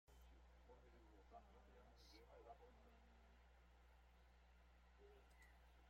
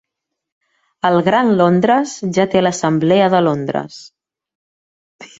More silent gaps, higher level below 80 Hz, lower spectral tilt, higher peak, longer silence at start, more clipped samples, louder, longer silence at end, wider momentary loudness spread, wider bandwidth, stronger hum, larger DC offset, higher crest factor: second, none vs 4.55-5.19 s; second, -70 dBFS vs -58 dBFS; about the same, -5 dB/octave vs -6 dB/octave; second, -52 dBFS vs -2 dBFS; second, 0.05 s vs 1.05 s; neither; second, -68 LUFS vs -15 LUFS; second, 0 s vs 0.15 s; second, 4 LU vs 8 LU; first, 16 kHz vs 8 kHz; first, 60 Hz at -70 dBFS vs none; neither; about the same, 16 dB vs 16 dB